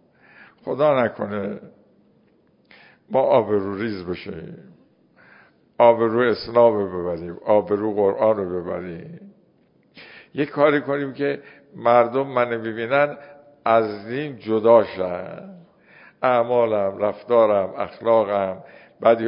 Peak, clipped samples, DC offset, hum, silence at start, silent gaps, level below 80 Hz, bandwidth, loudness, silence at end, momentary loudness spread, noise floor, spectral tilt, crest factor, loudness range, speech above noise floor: -2 dBFS; under 0.1%; under 0.1%; none; 0.65 s; none; -58 dBFS; 5.4 kHz; -21 LUFS; 0 s; 15 LU; -59 dBFS; -11 dB/octave; 20 dB; 5 LU; 39 dB